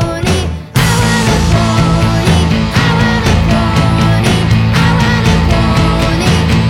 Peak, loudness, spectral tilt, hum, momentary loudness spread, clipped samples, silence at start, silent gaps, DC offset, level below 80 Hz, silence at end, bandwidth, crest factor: 0 dBFS; -11 LUFS; -5.5 dB/octave; none; 2 LU; under 0.1%; 0 s; none; under 0.1%; -20 dBFS; 0 s; 16.5 kHz; 10 dB